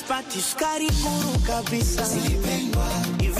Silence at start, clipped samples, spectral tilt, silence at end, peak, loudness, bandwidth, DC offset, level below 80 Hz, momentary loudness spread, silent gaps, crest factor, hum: 0 s; under 0.1%; -4 dB/octave; 0 s; -10 dBFS; -24 LUFS; 15.5 kHz; under 0.1%; -28 dBFS; 2 LU; none; 12 dB; none